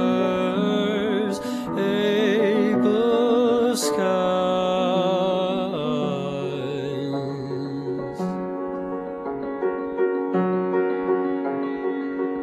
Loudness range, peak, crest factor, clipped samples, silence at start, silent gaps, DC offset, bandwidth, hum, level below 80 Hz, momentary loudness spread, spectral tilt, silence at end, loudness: 8 LU; -10 dBFS; 14 dB; under 0.1%; 0 s; none; under 0.1%; 14 kHz; none; -60 dBFS; 9 LU; -5.5 dB/octave; 0 s; -23 LUFS